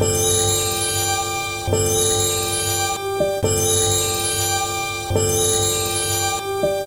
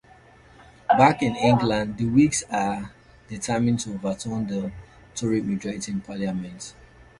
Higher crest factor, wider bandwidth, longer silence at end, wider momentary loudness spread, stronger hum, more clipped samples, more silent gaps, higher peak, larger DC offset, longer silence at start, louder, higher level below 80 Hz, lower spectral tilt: second, 16 dB vs 22 dB; first, 16 kHz vs 11.5 kHz; second, 0 s vs 0.5 s; second, 5 LU vs 18 LU; neither; neither; neither; about the same, -4 dBFS vs -4 dBFS; neither; second, 0 s vs 0.6 s; first, -18 LUFS vs -24 LUFS; first, -40 dBFS vs -50 dBFS; second, -2.5 dB/octave vs -5.5 dB/octave